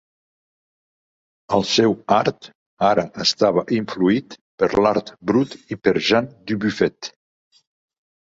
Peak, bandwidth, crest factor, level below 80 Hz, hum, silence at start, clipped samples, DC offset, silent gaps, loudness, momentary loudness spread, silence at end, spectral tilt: -2 dBFS; 7.8 kHz; 18 dB; -56 dBFS; none; 1.5 s; under 0.1%; under 0.1%; 2.55-2.77 s, 4.41-4.58 s; -20 LUFS; 7 LU; 1.2 s; -5 dB/octave